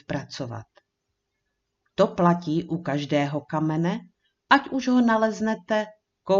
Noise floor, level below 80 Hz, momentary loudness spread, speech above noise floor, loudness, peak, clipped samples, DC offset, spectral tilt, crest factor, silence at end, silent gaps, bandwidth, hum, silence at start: -79 dBFS; -62 dBFS; 14 LU; 56 dB; -24 LUFS; -2 dBFS; under 0.1%; under 0.1%; -6.5 dB/octave; 22 dB; 0 s; none; 7.4 kHz; none; 0.1 s